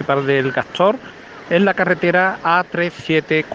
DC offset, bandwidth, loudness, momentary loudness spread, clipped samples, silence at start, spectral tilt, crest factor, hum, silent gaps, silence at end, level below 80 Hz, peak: under 0.1%; 7.8 kHz; -17 LUFS; 6 LU; under 0.1%; 0 s; -6.5 dB/octave; 16 dB; none; none; 0 s; -58 dBFS; 0 dBFS